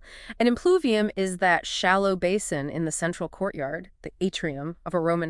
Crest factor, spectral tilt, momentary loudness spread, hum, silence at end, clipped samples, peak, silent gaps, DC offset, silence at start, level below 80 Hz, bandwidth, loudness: 18 dB; -4.5 dB/octave; 11 LU; none; 0 s; under 0.1%; -6 dBFS; none; under 0.1%; 0.05 s; -52 dBFS; 12 kHz; -25 LUFS